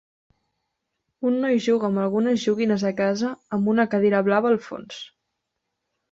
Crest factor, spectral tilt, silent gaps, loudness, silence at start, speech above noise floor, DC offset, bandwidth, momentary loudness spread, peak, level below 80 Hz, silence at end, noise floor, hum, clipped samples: 18 dB; -6.5 dB/octave; none; -22 LUFS; 1.2 s; 58 dB; under 0.1%; 7.8 kHz; 15 LU; -6 dBFS; -66 dBFS; 1.05 s; -80 dBFS; none; under 0.1%